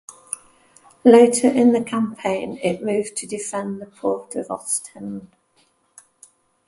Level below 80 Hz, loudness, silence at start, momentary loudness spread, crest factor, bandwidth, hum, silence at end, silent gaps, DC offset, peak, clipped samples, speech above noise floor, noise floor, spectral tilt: -64 dBFS; -19 LUFS; 0.3 s; 20 LU; 20 dB; 11.5 kHz; none; 1.45 s; none; under 0.1%; 0 dBFS; under 0.1%; 43 dB; -62 dBFS; -4.5 dB/octave